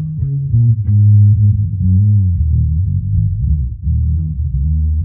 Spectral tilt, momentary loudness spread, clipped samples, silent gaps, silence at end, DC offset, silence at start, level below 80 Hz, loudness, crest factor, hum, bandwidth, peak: -18.5 dB/octave; 9 LU; under 0.1%; none; 0 s; under 0.1%; 0 s; -20 dBFS; -14 LUFS; 10 dB; none; 0.5 kHz; -2 dBFS